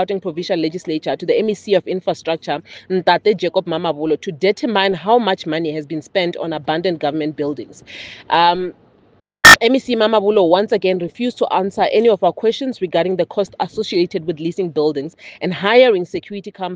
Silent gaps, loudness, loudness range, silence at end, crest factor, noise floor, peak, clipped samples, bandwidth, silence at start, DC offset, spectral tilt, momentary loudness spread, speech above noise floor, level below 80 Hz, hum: none; -16 LUFS; 7 LU; 0 s; 16 dB; -54 dBFS; 0 dBFS; 0.3%; 10 kHz; 0 s; under 0.1%; -4 dB/octave; 11 LU; 37 dB; -52 dBFS; none